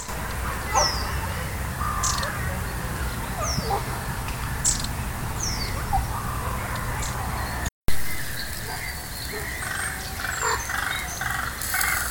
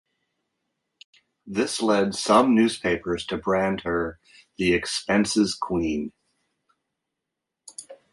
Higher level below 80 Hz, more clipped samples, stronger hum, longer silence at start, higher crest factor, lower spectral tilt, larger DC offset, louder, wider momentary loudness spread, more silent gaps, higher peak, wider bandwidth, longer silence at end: first, -34 dBFS vs -52 dBFS; neither; neither; second, 0 s vs 1.45 s; about the same, 20 dB vs 20 dB; second, -3 dB/octave vs -4.5 dB/octave; neither; second, -27 LUFS vs -23 LUFS; second, 7 LU vs 13 LU; first, 7.72-7.82 s vs none; second, -8 dBFS vs -4 dBFS; first, 18 kHz vs 11.5 kHz; second, 0 s vs 0.2 s